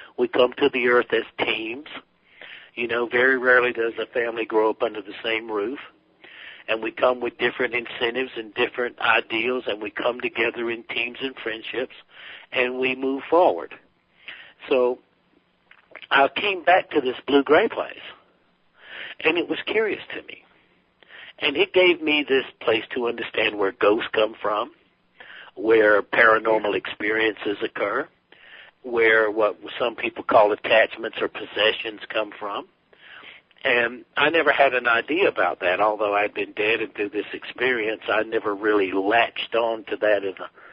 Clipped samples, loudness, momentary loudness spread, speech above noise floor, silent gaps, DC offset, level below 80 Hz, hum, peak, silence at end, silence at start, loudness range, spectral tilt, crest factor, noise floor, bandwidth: under 0.1%; -22 LUFS; 16 LU; 41 dB; none; under 0.1%; -68 dBFS; none; -4 dBFS; 0.25 s; 0 s; 5 LU; -0.5 dB/octave; 20 dB; -63 dBFS; 5.2 kHz